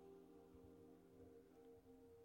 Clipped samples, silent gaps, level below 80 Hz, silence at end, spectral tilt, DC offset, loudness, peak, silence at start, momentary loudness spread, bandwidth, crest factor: under 0.1%; none; -80 dBFS; 0 s; -7 dB/octave; under 0.1%; -66 LUFS; -54 dBFS; 0 s; 2 LU; 16.5 kHz; 12 dB